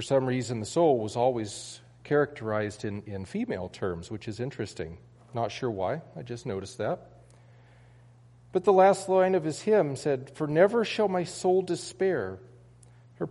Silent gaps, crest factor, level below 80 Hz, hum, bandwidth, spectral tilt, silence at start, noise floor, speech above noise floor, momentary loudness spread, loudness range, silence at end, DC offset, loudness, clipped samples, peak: none; 20 dB; -62 dBFS; none; 11.5 kHz; -6 dB/octave; 0 s; -55 dBFS; 28 dB; 15 LU; 10 LU; 0 s; under 0.1%; -28 LUFS; under 0.1%; -8 dBFS